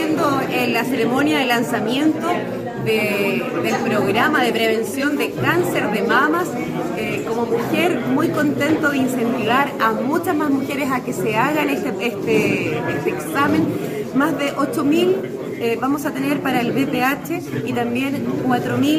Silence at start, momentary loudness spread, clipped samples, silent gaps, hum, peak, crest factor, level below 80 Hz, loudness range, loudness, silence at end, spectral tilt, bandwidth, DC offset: 0 s; 6 LU; under 0.1%; none; none; -4 dBFS; 16 dB; -56 dBFS; 2 LU; -19 LUFS; 0 s; -5.5 dB/octave; 16 kHz; under 0.1%